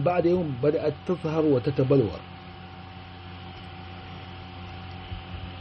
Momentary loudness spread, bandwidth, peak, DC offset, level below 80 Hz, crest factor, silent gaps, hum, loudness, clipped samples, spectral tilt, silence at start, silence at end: 20 LU; 6.2 kHz; -10 dBFS; under 0.1%; -52 dBFS; 18 dB; none; none; -25 LUFS; under 0.1%; -7 dB/octave; 0 s; 0 s